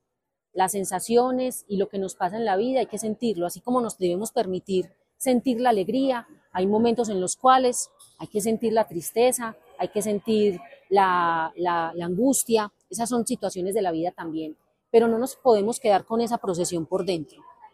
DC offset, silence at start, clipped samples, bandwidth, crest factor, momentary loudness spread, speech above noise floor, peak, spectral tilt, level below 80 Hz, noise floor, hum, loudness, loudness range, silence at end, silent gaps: under 0.1%; 0.55 s; under 0.1%; 15.5 kHz; 20 dB; 10 LU; 58 dB; -4 dBFS; -4.5 dB/octave; -66 dBFS; -82 dBFS; none; -24 LUFS; 3 LU; 0.05 s; none